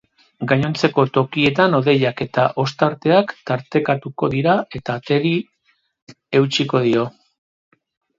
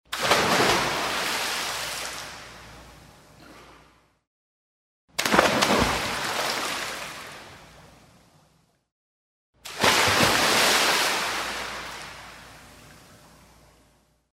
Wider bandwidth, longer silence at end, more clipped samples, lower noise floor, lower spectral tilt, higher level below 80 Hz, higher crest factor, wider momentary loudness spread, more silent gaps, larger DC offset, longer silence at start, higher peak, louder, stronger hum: second, 7.8 kHz vs 16 kHz; second, 1.1 s vs 1.4 s; neither; about the same, -64 dBFS vs -64 dBFS; first, -6.5 dB/octave vs -2 dB/octave; about the same, -56 dBFS vs -52 dBFS; second, 18 dB vs 26 dB; second, 8 LU vs 22 LU; second, 6.02-6.07 s vs 4.27-5.08 s, 8.92-9.53 s; neither; first, 0.4 s vs 0.1 s; about the same, 0 dBFS vs -2 dBFS; first, -18 LUFS vs -23 LUFS; neither